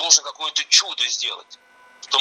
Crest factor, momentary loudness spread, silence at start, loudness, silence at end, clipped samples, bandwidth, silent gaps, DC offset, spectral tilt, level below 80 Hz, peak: 22 dB; 10 LU; 0 s; -18 LUFS; 0 s; under 0.1%; 17 kHz; none; under 0.1%; 5 dB/octave; -86 dBFS; 0 dBFS